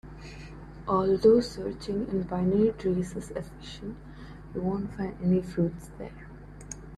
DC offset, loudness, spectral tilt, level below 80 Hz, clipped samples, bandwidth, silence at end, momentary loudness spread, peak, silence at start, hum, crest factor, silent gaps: under 0.1%; -28 LUFS; -7.5 dB/octave; -48 dBFS; under 0.1%; 12 kHz; 0 s; 22 LU; -10 dBFS; 0.05 s; none; 20 dB; none